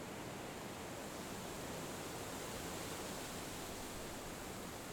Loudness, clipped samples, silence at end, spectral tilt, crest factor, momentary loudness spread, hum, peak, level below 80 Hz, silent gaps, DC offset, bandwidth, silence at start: -46 LUFS; under 0.1%; 0 s; -3.5 dB/octave; 14 dB; 3 LU; none; -34 dBFS; -62 dBFS; none; under 0.1%; over 20 kHz; 0 s